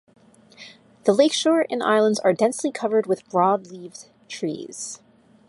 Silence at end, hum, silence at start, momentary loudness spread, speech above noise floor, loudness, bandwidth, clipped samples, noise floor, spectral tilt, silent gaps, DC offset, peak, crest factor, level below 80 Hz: 0.55 s; none; 0.6 s; 19 LU; 27 dB; -21 LUFS; 11.5 kHz; under 0.1%; -48 dBFS; -4 dB/octave; none; under 0.1%; -4 dBFS; 20 dB; -74 dBFS